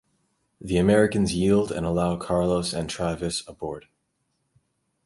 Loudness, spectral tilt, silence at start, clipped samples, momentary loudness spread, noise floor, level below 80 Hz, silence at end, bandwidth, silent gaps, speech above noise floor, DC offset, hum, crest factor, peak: -24 LUFS; -5.5 dB/octave; 0.6 s; under 0.1%; 15 LU; -74 dBFS; -46 dBFS; 1.25 s; 11.5 kHz; none; 51 dB; under 0.1%; none; 20 dB; -6 dBFS